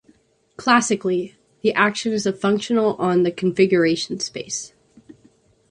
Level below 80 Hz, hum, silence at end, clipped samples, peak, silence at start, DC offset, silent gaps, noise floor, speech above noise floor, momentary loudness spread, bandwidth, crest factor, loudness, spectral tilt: -62 dBFS; none; 1.05 s; under 0.1%; -2 dBFS; 0.6 s; under 0.1%; none; -58 dBFS; 38 dB; 11 LU; 11 kHz; 20 dB; -20 LUFS; -4.5 dB/octave